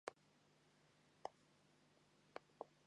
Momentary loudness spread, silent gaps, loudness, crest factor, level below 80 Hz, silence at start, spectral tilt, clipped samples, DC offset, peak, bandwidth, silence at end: 4 LU; none; -59 LUFS; 32 dB; under -90 dBFS; 0.05 s; -3.5 dB/octave; under 0.1%; under 0.1%; -30 dBFS; 10.5 kHz; 0 s